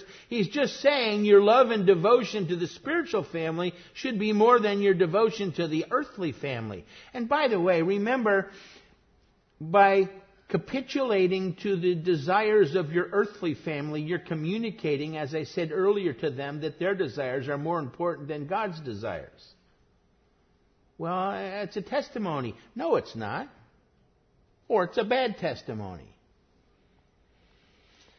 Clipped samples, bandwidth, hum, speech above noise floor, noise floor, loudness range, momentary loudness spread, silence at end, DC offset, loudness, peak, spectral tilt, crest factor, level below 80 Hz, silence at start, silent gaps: under 0.1%; 6.6 kHz; none; 40 dB; -66 dBFS; 10 LU; 14 LU; 2.15 s; under 0.1%; -27 LUFS; -8 dBFS; -6.5 dB/octave; 20 dB; -66 dBFS; 0 s; none